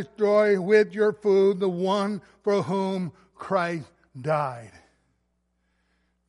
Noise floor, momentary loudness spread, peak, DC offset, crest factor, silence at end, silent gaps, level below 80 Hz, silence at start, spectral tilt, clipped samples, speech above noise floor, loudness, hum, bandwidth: -73 dBFS; 14 LU; -6 dBFS; under 0.1%; 18 dB; 1.6 s; none; -70 dBFS; 0 s; -7 dB/octave; under 0.1%; 49 dB; -24 LUFS; none; 11 kHz